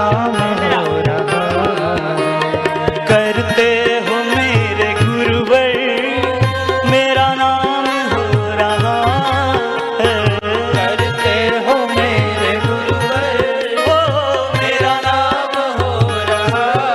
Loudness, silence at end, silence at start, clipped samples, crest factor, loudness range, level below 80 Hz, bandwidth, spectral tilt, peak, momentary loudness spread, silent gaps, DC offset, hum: -15 LUFS; 0 s; 0 s; under 0.1%; 12 dB; 1 LU; -44 dBFS; 13.5 kHz; -5.5 dB/octave; -2 dBFS; 4 LU; none; under 0.1%; none